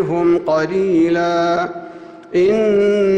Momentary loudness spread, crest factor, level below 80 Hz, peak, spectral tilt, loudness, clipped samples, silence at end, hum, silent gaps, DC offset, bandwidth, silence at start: 9 LU; 10 dB; -52 dBFS; -6 dBFS; -7 dB/octave; -16 LUFS; under 0.1%; 0 s; none; none; under 0.1%; 8.6 kHz; 0 s